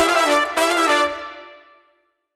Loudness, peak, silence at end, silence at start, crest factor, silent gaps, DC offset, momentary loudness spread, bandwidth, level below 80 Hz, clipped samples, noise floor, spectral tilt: -17 LUFS; -4 dBFS; 0.8 s; 0 s; 16 dB; none; under 0.1%; 18 LU; 16 kHz; -58 dBFS; under 0.1%; -64 dBFS; -1 dB/octave